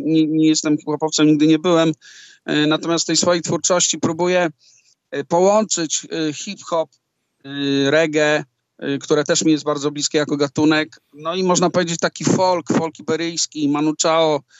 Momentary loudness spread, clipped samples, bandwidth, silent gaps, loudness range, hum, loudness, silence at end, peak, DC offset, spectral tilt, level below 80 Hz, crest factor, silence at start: 9 LU; under 0.1%; 8.2 kHz; none; 3 LU; none; -18 LUFS; 0.2 s; -4 dBFS; under 0.1%; -4 dB/octave; -70 dBFS; 16 dB; 0 s